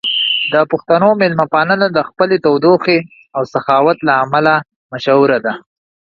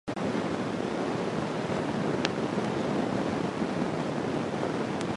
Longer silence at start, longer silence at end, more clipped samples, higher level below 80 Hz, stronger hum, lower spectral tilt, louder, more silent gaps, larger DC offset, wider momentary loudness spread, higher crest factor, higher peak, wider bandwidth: about the same, 0.05 s vs 0.05 s; first, 0.5 s vs 0 s; neither; about the same, -58 dBFS vs -56 dBFS; neither; about the same, -7 dB/octave vs -6 dB/octave; first, -13 LUFS vs -30 LUFS; first, 4.76-4.90 s vs none; neither; first, 9 LU vs 2 LU; second, 14 dB vs 24 dB; first, 0 dBFS vs -6 dBFS; second, 7.2 kHz vs 11.5 kHz